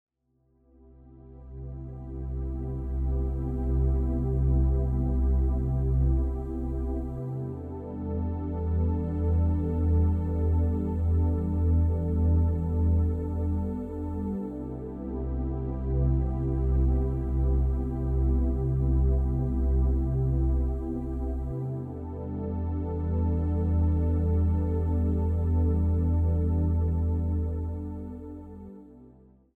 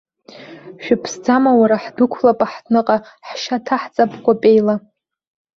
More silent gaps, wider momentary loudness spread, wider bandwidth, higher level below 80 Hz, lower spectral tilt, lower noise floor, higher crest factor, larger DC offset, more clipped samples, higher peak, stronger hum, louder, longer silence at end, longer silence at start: neither; second, 10 LU vs 13 LU; second, 2.3 kHz vs 7.4 kHz; first, -30 dBFS vs -60 dBFS; first, -12.5 dB/octave vs -5.5 dB/octave; first, -69 dBFS vs -39 dBFS; about the same, 12 dB vs 16 dB; neither; neither; second, -14 dBFS vs -2 dBFS; neither; second, -28 LUFS vs -16 LUFS; second, 0.5 s vs 0.8 s; first, 1.1 s vs 0.35 s